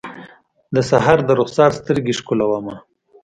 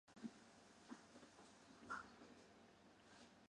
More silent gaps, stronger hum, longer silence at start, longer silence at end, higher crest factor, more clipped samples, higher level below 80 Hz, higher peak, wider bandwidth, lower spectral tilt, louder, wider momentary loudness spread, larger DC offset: neither; neither; about the same, 0.05 s vs 0.05 s; first, 0.45 s vs 0 s; about the same, 18 dB vs 22 dB; neither; first, -50 dBFS vs -86 dBFS; first, 0 dBFS vs -40 dBFS; about the same, 10 kHz vs 10.5 kHz; first, -6 dB/octave vs -4 dB/octave; first, -17 LUFS vs -61 LUFS; second, 10 LU vs 14 LU; neither